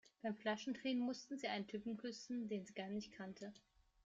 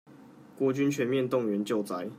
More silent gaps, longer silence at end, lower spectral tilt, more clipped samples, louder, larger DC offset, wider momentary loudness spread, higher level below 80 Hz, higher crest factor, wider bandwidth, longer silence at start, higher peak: neither; first, 0.45 s vs 0 s; second, -4.5 dB/octave vs -6.5 dB/octave; neither; second, -46 LUFS vs -29 LUFS; neither; first, 10 LU vs 4 LU; about the same, -80 dBFS vs -76 dBFS; about the same, 18 dB vs 14 dB; second, 7.8 kHz vs 16 kHz; first, 0.25 s vs 0.1 s; second, -30 dBFS vs -16 dBFS